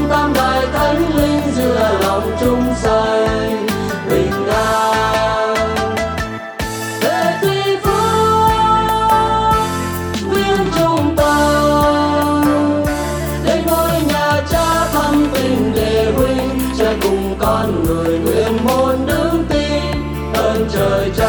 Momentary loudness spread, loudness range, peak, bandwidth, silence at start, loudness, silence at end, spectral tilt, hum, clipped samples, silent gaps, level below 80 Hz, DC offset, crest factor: 6 LU; 2 LU; -2 dBFS; over 20 kHz; 0 s; -15 LUFS; 0 s; -5.5 dB/octave; none; under 0.1%; none; -28 dBFS; under 0.1%; 14 dB